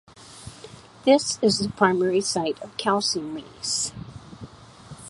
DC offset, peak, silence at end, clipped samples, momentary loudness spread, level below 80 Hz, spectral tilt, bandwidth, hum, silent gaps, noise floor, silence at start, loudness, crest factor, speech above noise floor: under 0.1%; -4 dBFS; 0 s; under 0.1%; 23 LU; -56 dBFS; -3.5 dB/octave; 11.5 kHz; none; none; -45 dBFS; 0.2 s; -23 LUFS; 22 dB; 22 dB